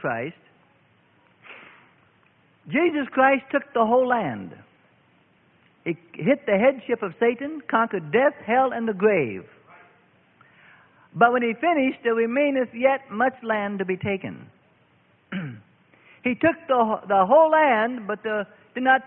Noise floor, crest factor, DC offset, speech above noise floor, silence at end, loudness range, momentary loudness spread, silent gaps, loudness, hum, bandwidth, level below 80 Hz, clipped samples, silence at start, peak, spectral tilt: -61 dBFS; 20 dB; under 0.1%; 39 dB; 0 s; 5 LU; 14 LU; none; -22 LUFS; none; 3.8 kHz; -68 dBFS; under 0.1%; 0 s; -4 dBFS; -10.5 dB/octave